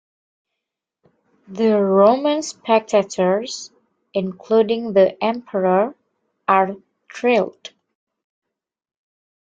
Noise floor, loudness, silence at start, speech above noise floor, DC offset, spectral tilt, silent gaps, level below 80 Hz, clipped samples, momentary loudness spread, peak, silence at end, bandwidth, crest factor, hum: -82 dBFS; -19 LUFS; 1.5 s; 65 dB; under 0.1%; -5.5 dB/octave; none; -66 dBFS; under 0.1%; 14 LU; -2 dBFS; 2.05 s; 9 kHz; 20 dB; none